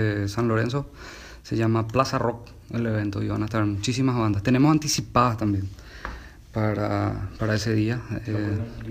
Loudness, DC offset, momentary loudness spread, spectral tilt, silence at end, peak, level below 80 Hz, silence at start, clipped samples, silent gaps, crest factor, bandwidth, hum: -25 LUFS; under 0.1%; 16 LU; -6 dB/octave; 0 s; -6 dBFS; -44 dBFS; 0 s; under 0.1%; none; 20 dB; 15.5 kHz; none